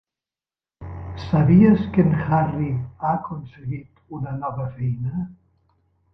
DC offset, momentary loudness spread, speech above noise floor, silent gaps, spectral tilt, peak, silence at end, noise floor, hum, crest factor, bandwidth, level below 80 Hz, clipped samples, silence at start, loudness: under 0.1%; 20 LU; over 70 dB; none; -11 dB/octave; -4 dBFS; 0.8 s; under -90 dBFS; none; 18 dB; 5.8 kHz; -44 dBFS; under 0.1%; 0.8 s; -21 LUFS